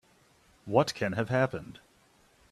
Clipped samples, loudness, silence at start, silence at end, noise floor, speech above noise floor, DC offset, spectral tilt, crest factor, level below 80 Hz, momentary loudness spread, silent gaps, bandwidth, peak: under 0.1%; -29 LUFS; 0.65 s; 0.8 s; -64 dBFS; 35 dB; under 0.1%; -6 dB/octave; 24 dB; -64 dBFS; 20 LU; none; 14 kHz; -8 dBFS